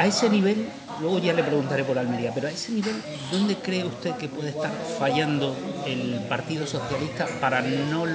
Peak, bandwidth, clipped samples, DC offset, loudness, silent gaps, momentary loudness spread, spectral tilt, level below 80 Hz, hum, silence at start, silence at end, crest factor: -6 dBFS; 9.8 kHz; under 0.1%; under 0.1%; -26 LUFS; none; 7 LU; -5 dB/octave; -64 dBFS; none; 0 s; 0 s; 20 dB